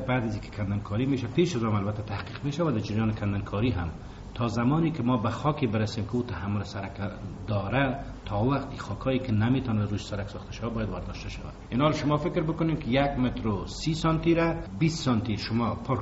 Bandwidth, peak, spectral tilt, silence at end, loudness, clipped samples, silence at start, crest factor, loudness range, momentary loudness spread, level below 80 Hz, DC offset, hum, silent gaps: 8 kHz; -10 dBFS; -6.5 dB/octave; 0 s; -28 LUFS; under 0.1%; 0 s; 18 dB; 3 LU; 10 LU; -44 dBFS; under 0.1%; none; none